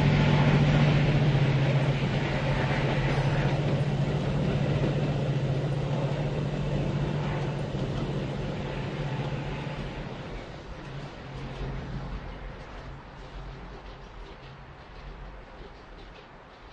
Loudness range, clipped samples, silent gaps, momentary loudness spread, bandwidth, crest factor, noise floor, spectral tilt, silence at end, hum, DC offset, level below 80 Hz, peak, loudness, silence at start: 18 LU; under 0.1%; none; 22 LU; 8.2 kHz; 18 dB; -48 dBFS; -7.5 dB/octave; 0 s; none; under 0.1%; -40 dBFS; -10 dBFS; -28 LUFS; 0 s